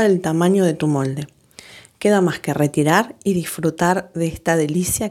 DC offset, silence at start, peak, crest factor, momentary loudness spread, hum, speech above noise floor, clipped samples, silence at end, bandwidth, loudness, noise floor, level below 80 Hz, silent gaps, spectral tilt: under 0.1%; 0 s; 0 dBFS; 18 dB; 6 LU; none; 25 dB; under 0.1%; 0 s; 16.5 kHz; -19 LUFS; -43 dBFS; -50 dBFS; none; -5.5 dB/octave